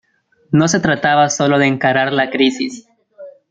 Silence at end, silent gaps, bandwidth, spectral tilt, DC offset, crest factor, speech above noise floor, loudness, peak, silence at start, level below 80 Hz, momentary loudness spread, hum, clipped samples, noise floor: 0.2 s; none; 9.2 kHz; -4.5 dB/octave; under 0.1%; 16 dB; 42 dB; -15 LUFS; 0 dBFS; 0.5 s; -54 dBFS; 4 LU; none; under 0.1%; -56 dBFS